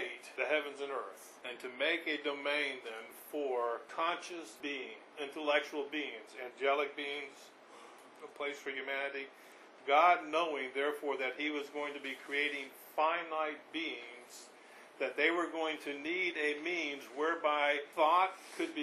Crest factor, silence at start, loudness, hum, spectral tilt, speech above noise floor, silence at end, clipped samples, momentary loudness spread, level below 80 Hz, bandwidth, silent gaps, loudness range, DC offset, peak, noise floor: 20 dB; 0 s; -35 LUFS; none; -2 dB/octave; 21 dB; 0 s; under 0.1%; 17 LU; under -90 dBFS; 14 kHz; none; 5 LU; under 0.1%; -16 dBFS; -57 dBFS